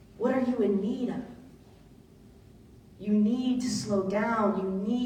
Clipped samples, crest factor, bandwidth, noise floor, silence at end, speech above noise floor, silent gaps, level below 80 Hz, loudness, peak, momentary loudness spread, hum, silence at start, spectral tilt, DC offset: under 0.1%; 16 dB; 10 kHz; -54 dBFS; 0 s; 26 dB; none; -60 dBFS; -28 LUFS; -14 dBFS; 8 LU; none; 0.2 s; -6 dB/octave; under 0.1%